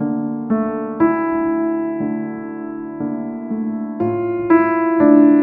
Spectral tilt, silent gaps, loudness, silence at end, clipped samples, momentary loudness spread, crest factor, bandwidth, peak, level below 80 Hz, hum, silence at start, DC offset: -12 dB/octave; none; -18 LUFS; 0 s; under 0.1%; 13 LU; 16 dB; 2.8 kHz; -2 dBFS; -58 dBFS; none; 0 s; under 0.1%